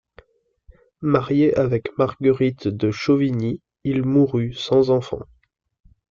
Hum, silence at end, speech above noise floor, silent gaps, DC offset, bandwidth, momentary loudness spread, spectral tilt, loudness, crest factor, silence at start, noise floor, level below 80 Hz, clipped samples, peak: none; 0.85 s; 37 dB; none; under 0.1%; 7.4 kHz; 9 LU; -8 dB/octave; -20 LUFS; 16 dB; 1 s; -57 dBFS; -52 dBFS; under 0.1%; -4 dBFS